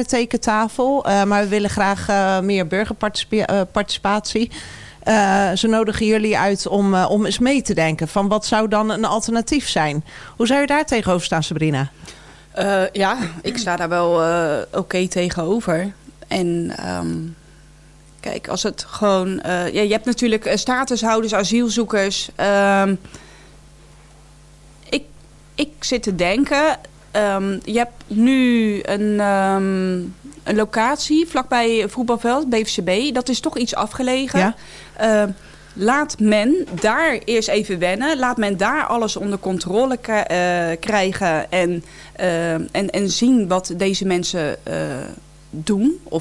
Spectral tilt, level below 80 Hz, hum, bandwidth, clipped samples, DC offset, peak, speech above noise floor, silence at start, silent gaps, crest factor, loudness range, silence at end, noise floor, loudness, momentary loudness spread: -4.5 dB/octave; -46 dBFS; none; 12 kHz; under 0.1%; under 0.1%; -2 dBFS; 27 dB; 0 s; none; 16 dB; 4 LU; 0 s; -46 dBFS; -19 LUFS; 8 LU